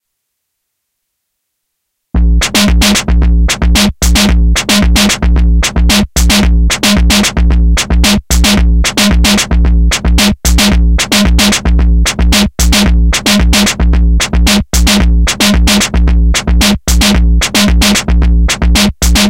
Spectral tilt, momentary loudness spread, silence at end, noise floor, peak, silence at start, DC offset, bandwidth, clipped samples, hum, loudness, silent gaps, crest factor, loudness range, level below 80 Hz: -3.5 dB/octave; 3 LU; 0 s; -70 dBFS; 0 dBFS; 2.15 s; under 0.1%; 16.5 kHz; under 0.1%; none; -9 LUFS; none; 8 dB; 1 LU; -10 dBFS